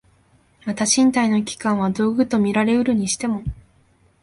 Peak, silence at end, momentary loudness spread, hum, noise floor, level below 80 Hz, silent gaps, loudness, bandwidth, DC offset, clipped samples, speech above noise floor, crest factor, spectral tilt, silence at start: -4 dBFS; 0.7 s; 11 LU; none; -58 dBFS; -46 dBFS; none; -19 LUFS; 11.5 kHz; under 0.1%; under 0.1%; 39 dB; 18 dB; -4 dB/octave; 0.65 s